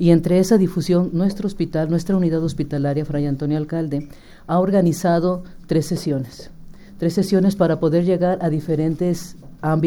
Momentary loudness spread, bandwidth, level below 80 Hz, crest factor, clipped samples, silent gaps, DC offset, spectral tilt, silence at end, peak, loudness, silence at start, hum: 9 LU; 17 kHz; -42 dBFS; 16 dB; under 0.1%; none; under 0.1%; -7.5 dB/octave; 0 s; -2 dBFS; -20 LUFS; 0 s; none